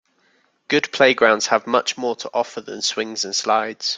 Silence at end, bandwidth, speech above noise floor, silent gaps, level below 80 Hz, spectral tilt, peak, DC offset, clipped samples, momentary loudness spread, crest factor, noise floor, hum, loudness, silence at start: 0 s; 9.4 kHz; 42 dB; none; -66 dBFS; -2 dB/octave; 0 dBFS; under 0.1%; under 0.1%; 9 LU; 20 dB; -62 dBFS; none; -19 LUFS; 0.7 s